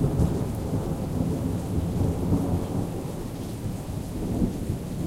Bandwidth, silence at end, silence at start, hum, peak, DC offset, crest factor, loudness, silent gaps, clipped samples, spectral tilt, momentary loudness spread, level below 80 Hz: 16 kHz; 0 s; 0 s; none; -10 dBFS; under 0.1%; 18 dB; -28 LUFS; none; under 0.1%; -8 dB/octave; 8 LU; -36 dBFS